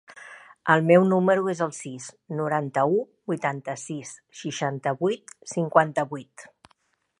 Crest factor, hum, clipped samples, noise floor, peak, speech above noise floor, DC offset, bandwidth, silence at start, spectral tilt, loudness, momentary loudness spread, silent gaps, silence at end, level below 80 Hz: 22 dB; none; under 0.1%; -68 dBFS; -2 dBFS; 43 dB; under 0.1%; 11 kHz; 0.15 s; -6 dB/octave; -24 LUFS; 19 LU; none; 0.75 s; -74 dBFS